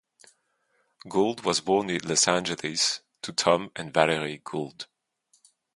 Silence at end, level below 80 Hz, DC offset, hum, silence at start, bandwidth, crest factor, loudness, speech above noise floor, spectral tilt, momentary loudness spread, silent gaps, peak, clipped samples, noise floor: 0.9 s; -64 dBFS; under 0.1%; none; 1.05 s; 11.5 kHz; 26 dB; -26 LUFS; 45 dB; -2.5 dB/octave; 12 LU; none; -2 dBFS; under 0.1%; -72 dBFS